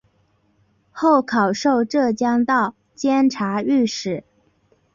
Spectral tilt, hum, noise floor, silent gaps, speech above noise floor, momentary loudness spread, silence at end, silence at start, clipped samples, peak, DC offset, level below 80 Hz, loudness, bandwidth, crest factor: -5 dB/octave; none; -62 dBFS; none; 44 dB; 8 LU; 0.75 s; 0.95 s; under 0.1%; -6 dBFS; under 0.1%; -62 dBFS; -19 LUFS; 7.6 kHz; 16 dB